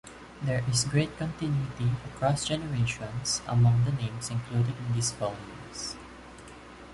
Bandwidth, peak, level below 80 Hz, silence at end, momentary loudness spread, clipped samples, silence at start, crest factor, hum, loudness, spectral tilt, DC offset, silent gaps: 11.5 kHz; -12 dBFS; -52 dBFS; 0 s; 20 LU; under 0.1%; 0.05 s; 16 dB; none; -29 LUFS; -5 dB/octave; under 0.1%; none